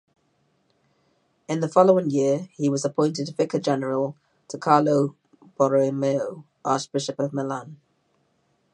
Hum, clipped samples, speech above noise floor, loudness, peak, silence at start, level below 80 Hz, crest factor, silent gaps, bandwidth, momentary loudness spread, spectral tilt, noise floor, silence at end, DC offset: none; under 0.1%; 46 dB; -23 LUFS; -2 dBFS; 1.5 s; -76 dBFS; 22 dB; none; 10.5 kHz; 12 LU; -6 dB/octave; -68 dBFS; 1 s; under 0.1%